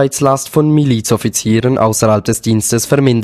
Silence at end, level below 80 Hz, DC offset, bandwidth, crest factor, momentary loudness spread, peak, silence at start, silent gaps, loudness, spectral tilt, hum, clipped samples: 0 s; -42 dBFS; under 0.1%; 15 kHz; 12 dB; 3 LU; 0 dBFS; 0 s; none; -13 LUFS; -5.5 dB/octave; none; under 0.1%